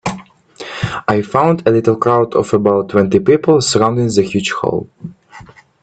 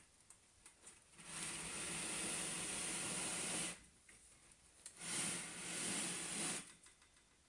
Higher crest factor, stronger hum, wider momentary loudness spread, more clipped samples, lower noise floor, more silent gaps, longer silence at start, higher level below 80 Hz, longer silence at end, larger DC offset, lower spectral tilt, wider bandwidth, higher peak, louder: about the same, 14 dB vs 16 dB; neither; second, 17 LU vs 22 LU; neither; second, -39 dBFS vs -70 dBFS; neither; about the same, 0.05 s vs 0 s; first, -48 dBFS vs -74 dBFS; about the same, 0.4 s vs 0.3 s; neither; first, -5.5 dB/octave vs -1 dB/octave; second, 9.2 kHz vs 11.5 kHz; first, 0 dBFS vs -30 dBFS; first, -14 LUFS vs -42 LUFS